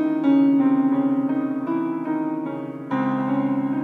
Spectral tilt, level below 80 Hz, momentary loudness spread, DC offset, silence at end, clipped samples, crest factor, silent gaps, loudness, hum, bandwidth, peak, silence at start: -9.5 dB/octave; -76 dBFS; 10 LU; under 0.1%; 0 s; under 0.1%; 12 dB; none; -22 LUFS; none; 3.9 kHz; -8 dBFS; 0 s